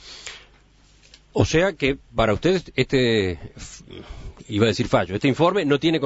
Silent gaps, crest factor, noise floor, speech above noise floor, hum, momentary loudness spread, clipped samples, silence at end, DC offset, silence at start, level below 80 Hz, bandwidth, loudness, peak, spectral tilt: none; 22 dB; -54 dBFS; 34 dB; 50 Hz at -50 dBFS; 20 LU; under 0.1%; 0 s; under 0.1%; 0.05 s; -42 dBFS; 8 kHz; -21 LUFS; -2 dBFS; -5.5 dB/octave